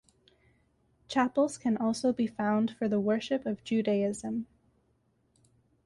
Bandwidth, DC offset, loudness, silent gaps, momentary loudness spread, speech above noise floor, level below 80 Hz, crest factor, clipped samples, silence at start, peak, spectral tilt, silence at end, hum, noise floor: 11.5 kHz; under 0.1%; -30 LUFS; none; 6 LU; 42 dB; -68 dBFS; 16 dB; under 0.1%; 1.1 s; -16 dBFS; -5.5 dB/octave; 1.4 s; none; -72 dBFS